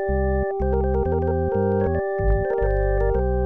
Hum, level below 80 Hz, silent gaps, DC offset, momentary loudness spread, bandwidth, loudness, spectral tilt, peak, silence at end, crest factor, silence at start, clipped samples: none; -26 dBFS; none; 0.7%; 2 LU; 3 kHz; -22 LUFS; -12 dB/octave; -10 dBFS; 0 s; 12 dB; 0 s; under 0.1%